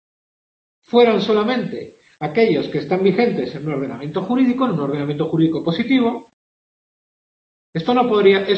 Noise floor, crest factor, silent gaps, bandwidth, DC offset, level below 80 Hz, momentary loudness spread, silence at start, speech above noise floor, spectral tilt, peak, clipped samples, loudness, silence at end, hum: under -90 dBFS; 18 dB; 6.33-7.73 s; 7.8 kHz; under 0.1%; -60 dBFS; 11 LU; 0.95 s; over 73 dB; -8 dB/octave; -2 dBFS; under 0.1%; -18 LUFS; 0 s; none